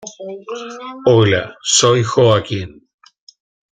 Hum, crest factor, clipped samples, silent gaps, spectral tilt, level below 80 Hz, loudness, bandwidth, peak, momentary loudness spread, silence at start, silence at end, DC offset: none; 16 dB; under 0.1%; none; -4 dB/octave; -52 dBFS; -14 LUFS; 9.6 kHz; 0 dBFS; 18 LU; 0 s; 1.05 s; under 0.1%